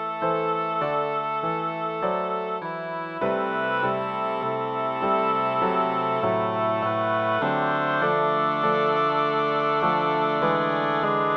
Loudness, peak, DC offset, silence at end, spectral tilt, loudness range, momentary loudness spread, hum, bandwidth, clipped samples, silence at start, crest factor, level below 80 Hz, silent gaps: -24 LUFS; -10 dBFS; under 0.1%; 0 s; -7.5 dB/octave; 4 LU; 5 LU; none; 6.6 kHz; under 0.1%; 0 s; 14 dB; -66 dBFS; none